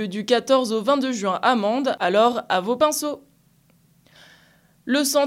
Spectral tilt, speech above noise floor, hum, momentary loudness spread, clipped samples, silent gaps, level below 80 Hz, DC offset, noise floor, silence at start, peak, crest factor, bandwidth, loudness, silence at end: -3.5 dB/octave; 38 dB; none; 7 LU; under 0.1%; none; -70 dBFS; under 0.1%; -59 dBFS; 0 s; -6 dBFS; 16 dB; 16.5 kHz; -21 LUFS; 0 s